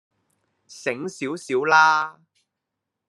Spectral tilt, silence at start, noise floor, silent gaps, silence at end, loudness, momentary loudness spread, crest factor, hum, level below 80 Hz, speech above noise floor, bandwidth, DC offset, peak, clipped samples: -3.5 dB/octave; 0.7 s; -83 dBFS; none; 1 s; -21 LUFS; 15 LU; 20 dB; none; -80 dBFS; 62 dB; 12 kHz; under 0.1%; -4 dBFS; under 0.1%